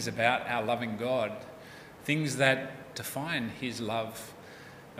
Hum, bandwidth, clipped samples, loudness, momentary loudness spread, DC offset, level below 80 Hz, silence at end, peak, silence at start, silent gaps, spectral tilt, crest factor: none; 16 kHz; under 0.1%; -31 LUFS; 21 LU; under 0.1%; -68 dBFS; 0 s; -8 dBFS; 0 s; none; -4.5 dB/octave; 24 dB